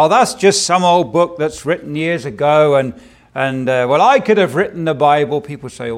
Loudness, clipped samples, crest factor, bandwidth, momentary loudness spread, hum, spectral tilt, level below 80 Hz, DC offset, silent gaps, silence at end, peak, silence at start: -14 LUFS; under 0.1%; 14 dB; 15.5 kHz; 9 LU; none; -4.5 dB/octave; -52 dBFS; under 0.1%; none; 0 s; 0 dBFS; 0 s